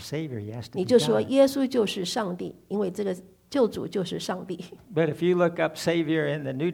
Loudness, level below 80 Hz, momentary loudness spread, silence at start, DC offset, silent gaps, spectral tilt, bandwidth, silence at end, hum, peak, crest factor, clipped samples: -26 LUFS; -64 dBFS; 13 LU; 0 s; under 0.1%; none; -5.5 dB/octave; 17.5 kHz; 0 s; none; -8 dBFS; 18 dB; under 0.1%